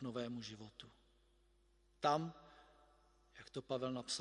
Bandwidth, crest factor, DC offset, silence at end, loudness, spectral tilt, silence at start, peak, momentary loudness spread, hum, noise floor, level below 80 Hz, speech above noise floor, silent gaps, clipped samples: 11.5 kHz; 26 dB; under 0.1%; 0 s; -43 LUFS; -4.5 dB/octave; 0 s; -20 dBFS; 23 LU; none; -73 dBFS; -74 dBFS; 31 dB; none; under 0.1%